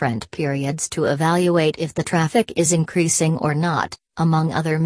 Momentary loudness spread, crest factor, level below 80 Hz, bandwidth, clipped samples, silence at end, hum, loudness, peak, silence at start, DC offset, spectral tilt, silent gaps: 6 LU; 16 dB; -54 dBFS; 11 kHz; under 0.1%; 0 s; none; -20 LUFS; -4 dBFS; 0 s; under 0.1%; -5 dB/octave; none